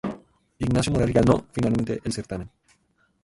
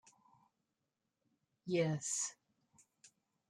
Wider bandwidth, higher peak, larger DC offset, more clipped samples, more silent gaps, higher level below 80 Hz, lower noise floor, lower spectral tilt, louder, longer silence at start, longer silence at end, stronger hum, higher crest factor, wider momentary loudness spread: second, 11.5 kHz vs 13 kHz; first, -6 dBFS vs -24 dBFS; neither; neither; neither; first, -42 dBFS vs -84 dBFS; second, -66 dBFS vs -88 dBFS; first, -6.5 dB/octave vs -4 dB/octave; first, -24 LUFS vs -38 LUFS; second, 0.05 s vs 1.65 s; first, 0.75 s vs 0.4 s; neither; about the same, 18 dB vs 22 dB; first, 15 LU vs 8 LU